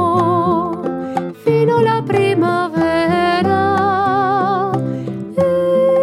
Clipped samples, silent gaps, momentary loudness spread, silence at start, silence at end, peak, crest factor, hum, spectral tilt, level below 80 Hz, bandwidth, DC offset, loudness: under 0.1%; none; 7 LU; 0 s; 0 s; -2 dBFS; 12 dB; none; -7.5 dB/octave; -54 dBFS; 13 kHz; under 0.1%; -16 LUFS